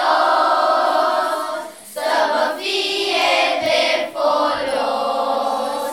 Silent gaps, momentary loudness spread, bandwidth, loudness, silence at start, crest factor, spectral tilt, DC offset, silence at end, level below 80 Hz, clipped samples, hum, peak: none; 7 LU; 17 kHz; -18 LUFS; 0 s; 14 dB; -1.5 dB/octave; 0.1%; 0 s; -62 dBFS; under 0.1%; none; -4 dBFS